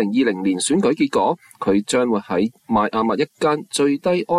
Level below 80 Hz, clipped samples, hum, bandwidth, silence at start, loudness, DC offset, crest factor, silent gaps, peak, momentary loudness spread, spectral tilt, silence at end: -60 dBFS; under 0.1%; none; 13 kHz; 0 s; -20 LUFS; under 0.1%; 12 dB; none; -6 dBFS; 3 LU; -4.5 dB/octave; 0 s